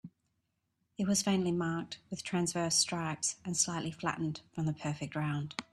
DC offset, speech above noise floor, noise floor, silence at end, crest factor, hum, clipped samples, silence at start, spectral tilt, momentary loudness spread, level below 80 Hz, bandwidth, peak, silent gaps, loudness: under 0.1%; 47 dB; -81 dBFS; 0.1 s; 20 dB; none; under 0.1%; 0.05 s; -3.5 dB/octave; 9 LU; -70 dBFS; 13.5 kHz; -16 dBFS; none; -34 LUFS